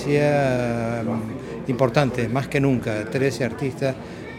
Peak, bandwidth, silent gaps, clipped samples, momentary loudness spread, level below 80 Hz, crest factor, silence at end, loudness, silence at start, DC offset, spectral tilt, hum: -2 dBFS; 14.5 kHz; none; under 0.1%; 9 LU; -48 dBFS; 20 dB; 0 s; -23 LUFS; 0 s; under 0.1%; -7 dB/octave; none